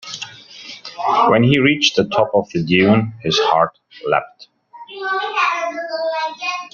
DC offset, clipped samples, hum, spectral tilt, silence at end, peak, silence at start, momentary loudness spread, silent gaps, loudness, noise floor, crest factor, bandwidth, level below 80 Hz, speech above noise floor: under 0.1%; under 0.1%; none; -5 dB/octave; 0.05 s; 0 dBFS; 0.05 s; 17 LU; none; -17 LUFS; -38 dBFS; 18 dB; 7.4 kHz; -56 dBFS; 22 dB